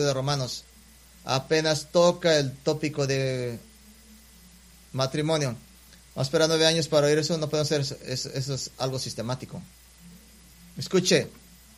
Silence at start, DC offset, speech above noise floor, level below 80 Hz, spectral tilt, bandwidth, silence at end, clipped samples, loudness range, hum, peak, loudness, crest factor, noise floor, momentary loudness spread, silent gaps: 0 s; under 0.1%; 27 dB; -56 dBFS; -4.5 dB/octave; 15.5 kHz; 0.45 s; under 0.1%; 6 LU; none; -6 dBFS; -25 LUFS; 20 dB; -52 dBFS; 16 LU; none